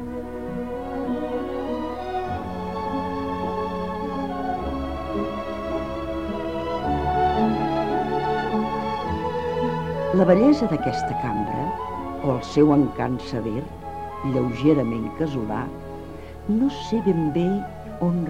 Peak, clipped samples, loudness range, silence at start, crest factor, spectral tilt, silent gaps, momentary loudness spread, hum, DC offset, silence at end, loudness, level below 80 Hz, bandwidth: -4 dBFS; under 0.1%; 6 LU; 0 s; 20 dB; -8 dB/octave; none; 10 LU; none; 0.5%; 0 s; -24 LUFS; -42 dBFS; 13 kHz